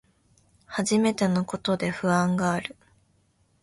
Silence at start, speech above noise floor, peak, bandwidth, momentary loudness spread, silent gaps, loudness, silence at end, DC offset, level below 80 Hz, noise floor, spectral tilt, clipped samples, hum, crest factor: 0.7 s; 41 dB; -10 dBFS; 11.5 kHz; 8 LU; none; -25 LUFS; 0.9 s; under 0.1%; -60 dBFS; -66 dBFS; -5.5 dB/octave; under 0.1%; none; 18 dB